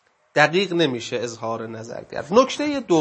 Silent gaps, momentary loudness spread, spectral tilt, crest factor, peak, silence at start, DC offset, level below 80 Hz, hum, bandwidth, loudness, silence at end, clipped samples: none; 14 LU; -4.5 dB/octave; 20 dB; 0 dBFS; 0.35 s; under 0.1%; -62 dBFS; none; 8.6 kHz; -21 LUFS; 0 s; under 0.1%